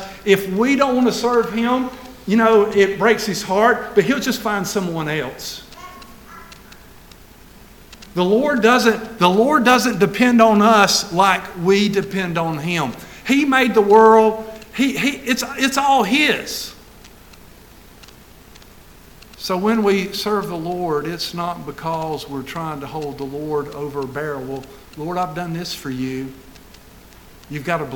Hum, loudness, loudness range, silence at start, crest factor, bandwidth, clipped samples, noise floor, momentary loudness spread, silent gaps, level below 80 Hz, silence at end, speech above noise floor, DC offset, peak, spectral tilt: none; -17 LUFS; 12 LU; 0 s; 18 dB; 19 kHz; under 0.1%; -44 dBFS; 15 LU; none; -50 dBFS; 0 s; 26 dB; under 0.1%; 0 dBFS; -4.5 dB/octave